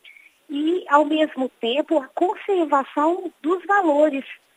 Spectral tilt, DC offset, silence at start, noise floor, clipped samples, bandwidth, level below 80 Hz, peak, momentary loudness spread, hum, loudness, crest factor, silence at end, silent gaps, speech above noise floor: -4 dB/octave; under 0.1%; 0.05 s; -49 dBFS; under 0.1%; 10.5 kHz; -86 dBFS; -2 dBFS; 8 LU; none; -21 LUFS; 20 dB; 0.2 s; none; 29 dB